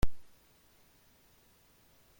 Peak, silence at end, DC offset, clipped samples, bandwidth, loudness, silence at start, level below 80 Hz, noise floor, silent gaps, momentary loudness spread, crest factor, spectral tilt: -16 dBFS; 0 s; under 0.1%; under 0.1%; 16.5 kHz; -54 LUFS; 0 s; -46 dBFS; -65 dBFS; none; 4 LU; 20 dB; -6 dB/octave